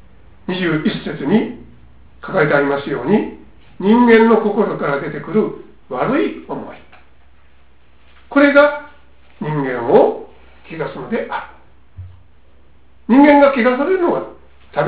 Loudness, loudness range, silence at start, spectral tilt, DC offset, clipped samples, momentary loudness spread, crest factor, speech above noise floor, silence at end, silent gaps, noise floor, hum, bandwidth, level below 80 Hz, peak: -15 LUFS; 6 LU; 0.5 s; -10.5 dB/octave; 0.7%; under 0.1%; 19 LU; 16 dB; 37 dB; 0 s; none; -52 dBFS; none; 4 kHz; -48 dBFS; 0 dBFS